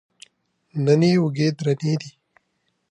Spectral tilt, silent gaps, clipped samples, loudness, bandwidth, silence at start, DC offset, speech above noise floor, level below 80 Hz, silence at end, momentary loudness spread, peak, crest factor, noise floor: -7 dB/octave; none; under 0.1%; -21 LUFS; 10.5 kHz; 0.75 s; under 0.1%; 52 dB; -66 dBFS; 0.8 s; 13 LU; -4 dBFS; 18 dB; -72 dBFS